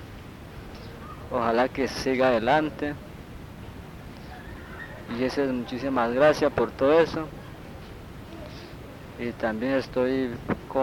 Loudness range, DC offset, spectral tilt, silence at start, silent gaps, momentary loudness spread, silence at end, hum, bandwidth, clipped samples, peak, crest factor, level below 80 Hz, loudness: 6 LU; under 0.1%; -6 dB/octave; 0 s; none; 21 LU; 0 s; none; 18 kHz; under 0.1%; -8 dBFS; 20 dB; -48 dBFS; -25 LUFS